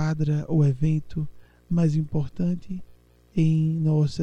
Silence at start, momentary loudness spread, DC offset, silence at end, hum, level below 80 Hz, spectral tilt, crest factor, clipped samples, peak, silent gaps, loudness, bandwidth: 0 s; 11 LU; under 0.1%; 0 s; none; -46 dBFS; -9 dB/octave; 12 dB; under 0.1%; -10 dBFS; none; -25 LUFS; 8 kHz